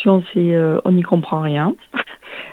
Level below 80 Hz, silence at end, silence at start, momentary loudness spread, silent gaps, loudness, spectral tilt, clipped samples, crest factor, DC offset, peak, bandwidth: -64 dBFS; 0 s; 0 s; 10 LU; none; -17 LUFS; -9.5 dB/octave; under 0.1%; 16 dB; under 0.1%; 0 dBFS; 4.1 kHz